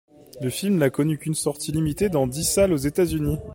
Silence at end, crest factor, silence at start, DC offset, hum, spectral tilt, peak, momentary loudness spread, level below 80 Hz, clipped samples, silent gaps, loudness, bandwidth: 0 s; 18 dB; 0.35 s; under 0.1%; none; -5.5 dB/octave; -6 dBFS; 6 LU; -42 dBFS; under 0.1%; none; -23 LUFS; 17 kHz